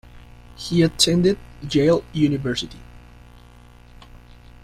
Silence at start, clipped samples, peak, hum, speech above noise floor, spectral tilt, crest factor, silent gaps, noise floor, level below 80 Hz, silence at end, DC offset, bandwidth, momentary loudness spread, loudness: 0.15 s; under 0.1%; -2 dBFS; 60 Hz at -40 dBFS; 27 dB; -5 dB/octave; 20 dB; none; -46 dBFS; -44 dBFS; 0.45 s; under 0.1%; 15.5 kHz; 12 LU; -20 LUFS